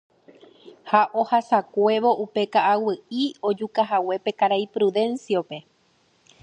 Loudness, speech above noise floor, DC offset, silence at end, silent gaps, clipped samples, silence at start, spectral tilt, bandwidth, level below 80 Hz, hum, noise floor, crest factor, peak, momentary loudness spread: -22 LUFS; 41 dB; under 0.1%; 0.8 s; none; under 0.1%; 0.65 s; -5.5 dB/octave; 9 kHz; -78 dBFS; none; -63 dBFS; 20 dB; -4 dBFS; 7 LU